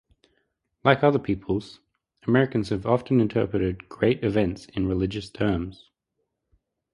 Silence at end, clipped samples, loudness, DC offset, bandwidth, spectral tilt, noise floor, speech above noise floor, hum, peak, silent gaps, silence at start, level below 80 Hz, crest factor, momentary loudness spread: 1.2 s; under 0.1%; -25 LUFS; under 0.1%; 11 kHz; -8 dB/octave; -79 dBFS; 55 dB; none; -2 dBFS; none; 0.85 s; -46 dBFS; 24 dB; 9 LU